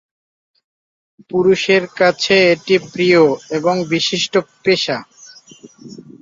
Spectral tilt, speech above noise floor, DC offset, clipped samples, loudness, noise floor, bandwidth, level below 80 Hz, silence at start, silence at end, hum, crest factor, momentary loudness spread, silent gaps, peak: -4.5 dB/octave; 27 dB; under 0.1%; under 0.1%; -15 LUFS; -42 dBFS; 7.6 kHz; -58 dBFS; 1.35 s; 0.2 s; none; 16 dB; 6 LU; none; 0 dBFS